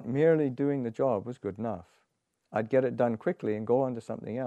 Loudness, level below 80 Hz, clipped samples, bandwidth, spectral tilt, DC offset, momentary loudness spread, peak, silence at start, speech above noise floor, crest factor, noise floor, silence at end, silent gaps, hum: -30 LUFS; -72 dBFS; under 0.1%; 8.8 kHz; -9 dB/octave; under 0.1%; 12 LU; -12 dBFS; 0 s; 49 dB; 16 dB; -78 dBFS; 0 s; none; none